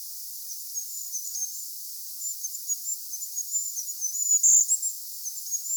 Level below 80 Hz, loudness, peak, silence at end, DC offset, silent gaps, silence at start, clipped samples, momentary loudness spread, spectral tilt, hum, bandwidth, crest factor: under -90 dBFS; -26 LUFS; -10 dBFS; 0 s; under 0.1%; none; 0 s; under 0.1%; 16 LU; 11.5 dB/octave; none; over 20 kHz; 20 dB